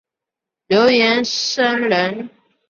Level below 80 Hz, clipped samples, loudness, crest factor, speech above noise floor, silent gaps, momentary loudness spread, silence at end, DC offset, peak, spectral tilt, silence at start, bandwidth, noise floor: -62 dBFS; under 0.1%; -16 LUFS; 16 dB; 69 dB; none; 12 LU; 0.4 s; under 0.1%; -2 dBFS; -3.5 dB/octave; 0.7 s; 7.4 kHz; -85 dBFS